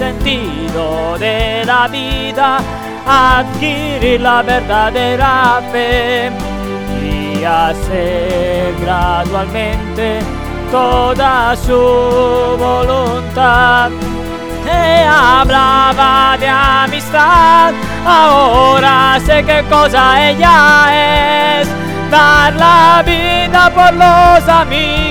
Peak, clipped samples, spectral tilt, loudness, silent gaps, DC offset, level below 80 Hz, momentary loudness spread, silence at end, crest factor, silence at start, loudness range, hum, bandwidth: 0 dBFS; 0.6%; -4.5 dB/octave; -10 LUFS; none; under 0.1%; -24 dBFS; 11 LU; 0 s; 10 dB; 0 s; 7 LU; none; over 20 kHz